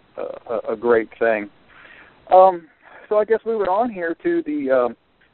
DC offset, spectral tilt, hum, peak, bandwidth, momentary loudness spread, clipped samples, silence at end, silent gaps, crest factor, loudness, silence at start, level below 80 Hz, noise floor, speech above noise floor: under 0.1%; -4 dB/octave; none; -2 dBFS; 4.3 kHz; 14 LU; under 0.1%; 0.4 s; none; 20 dB; -19 LUFS; 0.15 s; -60 dBFS; -46 dBFS; 28 dB